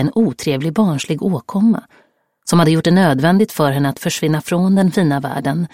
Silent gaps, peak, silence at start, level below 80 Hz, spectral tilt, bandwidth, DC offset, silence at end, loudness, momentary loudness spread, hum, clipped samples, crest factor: none; -2 dBFS; 0 s; -54 dBFS; -6 dB/octave; 16.5 kHz; under 0.1%; 0.05 s; -16 LUFS; 7 LU; none; under 0.1%; 14 dB